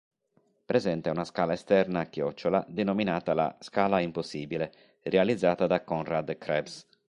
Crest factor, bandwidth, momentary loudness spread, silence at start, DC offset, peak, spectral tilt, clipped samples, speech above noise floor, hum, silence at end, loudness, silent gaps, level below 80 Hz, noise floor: 20 dB; 11 kHz; 8 LU; 0.7 s; under 0.1%; -10 dBFS; -6.5 dB/octave; under 0.1%; 42 dB; none; 0.25 s; -29 LUFS; none; -62 dBFS; -70 dBFS